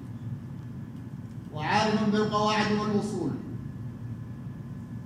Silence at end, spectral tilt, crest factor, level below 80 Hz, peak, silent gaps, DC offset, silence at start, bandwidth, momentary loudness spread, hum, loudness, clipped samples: 0 s; -6 dB/octave; 18 dB; -56 dBFS; -12 dBFS; none; under 0.1%; 0 s; 11 kHz; 15 LU; none; -29 LUFS; under 0.1%